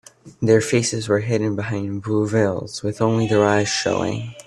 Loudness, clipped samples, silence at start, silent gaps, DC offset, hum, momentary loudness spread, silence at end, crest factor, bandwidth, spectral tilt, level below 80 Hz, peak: -20 LUFS; under 0.1%; 0.25 s; none; under 0.1%; none; 9 LU; 0.05 s; 18 dB; 12.5 kHz; -5 dB/octave; -56 dBFS; -2 dBFS